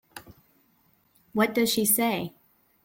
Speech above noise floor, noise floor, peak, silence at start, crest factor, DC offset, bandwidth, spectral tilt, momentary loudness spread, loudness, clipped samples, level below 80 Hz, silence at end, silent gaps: 41 dB; -66 dBFS; -10 dBFS; 0.15 s; 20 dB; under 0.1%; 17 kHz; -3 dB/octave; 22 LU; -24 LUFS; under 0.1%; -66 dBFS; 0.55 s; none